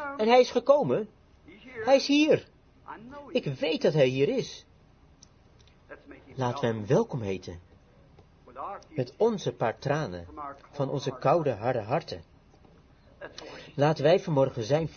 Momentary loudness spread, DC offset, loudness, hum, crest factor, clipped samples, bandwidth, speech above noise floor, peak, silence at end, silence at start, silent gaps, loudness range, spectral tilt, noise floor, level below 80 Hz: 21 LU; under 0.1%; -27 LUFS; none; 20 dB; under 0.1%; 6.8 kHz; 31 dB; -8 dBFS; 0.05 s; 0 s; none; 6 LU; -6 dB/octave; -58 dBFS; -62 dBFS